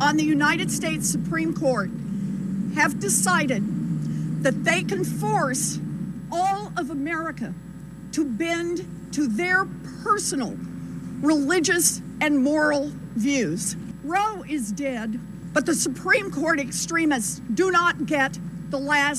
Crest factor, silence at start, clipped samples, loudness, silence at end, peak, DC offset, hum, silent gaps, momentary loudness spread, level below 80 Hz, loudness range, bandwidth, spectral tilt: 18 dB; 0 s; under 0.1%; -24 LUFS; 0 s; -6 dBFS; under 0.1%; none; none; 11 LU; -52 dBFS; 4 LU; 14.5 kHz; -4 dB/octave